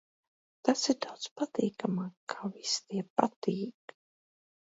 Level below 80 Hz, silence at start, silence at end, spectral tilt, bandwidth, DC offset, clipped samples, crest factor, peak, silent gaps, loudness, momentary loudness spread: -80 dBFS; 0.65 s; 1 s; -4 dB/octave; 8 kHz; under 0.1%; under 0.1%; 28 dB; -8 dBFS; 1.31-1.36 s, 2.17-2.27 s, 3.10-3.16 s, 3.36-3.42 s; -33 LUFS; 10 LU